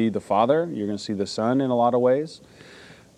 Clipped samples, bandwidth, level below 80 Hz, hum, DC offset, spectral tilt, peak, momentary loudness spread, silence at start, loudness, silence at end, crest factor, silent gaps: under 0.1%; 10.5 kHz; -68 dBFS; none; under 0.1%; -6.5 dB/octave; -8 dBFS; 8 LU; 0 s; -23 LUFS; 0.25 s; 16 dB; none